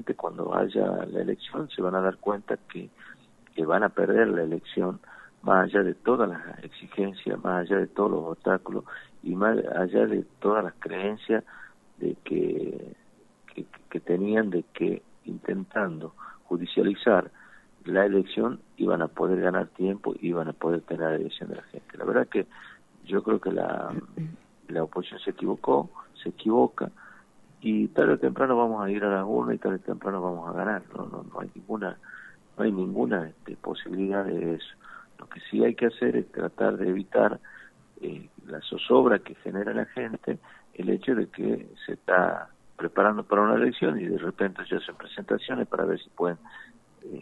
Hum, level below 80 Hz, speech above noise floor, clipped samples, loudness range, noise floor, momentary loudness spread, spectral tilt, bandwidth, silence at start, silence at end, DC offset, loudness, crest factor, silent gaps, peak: none; -70 dBFS; 29 dB; under 0.1%; 5 LU; -56 dBFS; 16 LU; -8 dB/octave; 8.2 kHz; 0 s; 0 s; under 0.1%; -27 LUFS; 22 dB; none; -6 dBFS